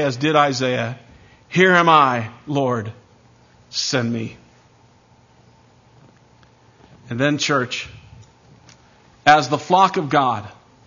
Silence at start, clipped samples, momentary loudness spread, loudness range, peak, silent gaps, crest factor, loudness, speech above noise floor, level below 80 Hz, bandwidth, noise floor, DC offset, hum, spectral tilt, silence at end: 0 s; under 0.1%; 15 LU; 10 LU; 0 dBFS; none; 20 dB; -18 LUFS; 35 dB; -60 dBFS; 7.4 kHz; -53 dBFS; under 0.1%; none; -4.5 dB/octave; 0.35 s